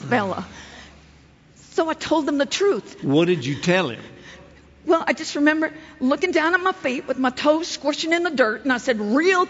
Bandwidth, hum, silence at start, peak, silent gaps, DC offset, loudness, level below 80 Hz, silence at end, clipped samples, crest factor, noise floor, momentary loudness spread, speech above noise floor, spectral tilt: 8 kHz; none; 0 s; -4 dBFS; none; under 0.1%; -21 LUFS; -56 dBFS; 0 s; under 0.1%; 18 dB; -51 dBFS; 9 LU; 30 dB; -4.5 dB/octave